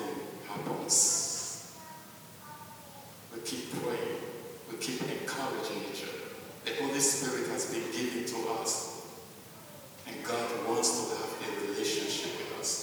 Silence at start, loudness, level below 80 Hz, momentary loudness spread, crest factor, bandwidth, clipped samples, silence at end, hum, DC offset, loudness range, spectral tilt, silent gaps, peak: 0 s; -32 LUFS; -76 dBFS; 21 LU; 22 dB; over 20 kHz; under 0.1%; 0 s; none; under 0.1%; 7 LU; -2 dB/octave; none; -12 dBFS